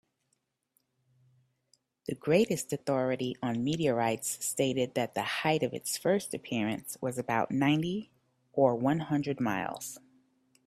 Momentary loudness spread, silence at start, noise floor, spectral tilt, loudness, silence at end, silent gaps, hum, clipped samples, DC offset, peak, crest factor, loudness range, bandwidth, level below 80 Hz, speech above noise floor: 10 LU; 2.1 s; -79 dBFS; -5 dB/octave; -31 LUFS; 0.7 s; none; none; under 0.1%; under 0.1%; -12 dBFS; 20 dB; 2 LU; 15.5 kHz; -68 dBFS; 49 dB